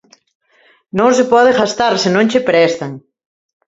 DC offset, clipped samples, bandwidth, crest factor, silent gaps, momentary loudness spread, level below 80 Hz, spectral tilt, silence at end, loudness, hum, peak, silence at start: under 0.1%; under 0.1%; 7.8 kHz; 14 dB; none; 11 LU; -54 dBFS; -4.5 dB/octave; 0.7 s; -13 LUFS; none; 0 dBFS; 0.95 s